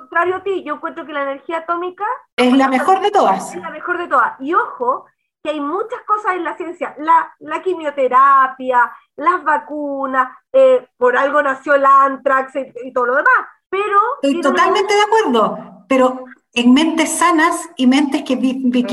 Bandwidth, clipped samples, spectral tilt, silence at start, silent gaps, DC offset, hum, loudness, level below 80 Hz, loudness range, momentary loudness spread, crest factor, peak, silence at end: 12.5 kHz; under 0.1%; -3 dB/octave; 0 s; 2.33-2.37 s, 13.66-13.70 s; under 0.1%; none; -16 LUFS; -66 dBFS; 5 LU; 12 LU; 12 dB; -4 dBFS; 0 s